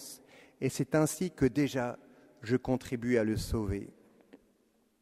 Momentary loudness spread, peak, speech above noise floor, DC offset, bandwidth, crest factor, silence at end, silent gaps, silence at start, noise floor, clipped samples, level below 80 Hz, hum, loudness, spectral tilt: 18 LU; -14 dBFS; 40 dB; under 0.1%; 15 kHz; 20 dB; 0.65 s; none; 0 s; -71 dBFS; under 0.1%; -50 dBFS; none; -32 LUFS; -6 dB/octave